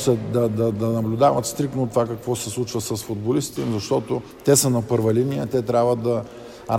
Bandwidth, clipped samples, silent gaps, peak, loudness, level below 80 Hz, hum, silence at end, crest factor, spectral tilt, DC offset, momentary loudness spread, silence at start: 16.5 kHz; under 0.1%; none; -4 dBFS; -22 LUFS; -52 dBFS; none; 0 s; 18 dB; -5.5 dB/octave; under 0.1%; 8 LU; 0 s